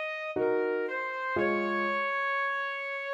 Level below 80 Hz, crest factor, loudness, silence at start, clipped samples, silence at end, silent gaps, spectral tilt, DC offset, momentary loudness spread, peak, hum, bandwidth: -70 dBFS; 14 dB; -30 LUFS; 0 s; under 0.1%; 0 s; none; -6 dB/octave; under 0.1%; 4 LU; -18 dBFS; none; 10.5 kHz